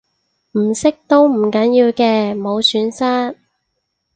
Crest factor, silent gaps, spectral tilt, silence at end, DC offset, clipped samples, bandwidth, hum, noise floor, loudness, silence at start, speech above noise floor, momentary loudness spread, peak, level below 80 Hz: 16 dB; none; -4.5 dB/octave; 0.8 s; under 0.1%; under 0.1%; 9.4 kHz; none; -72 dBFS; -15 LUFS; 0.55 s; 57 dB; 7 LU; 0 dBFS; -58 dBFS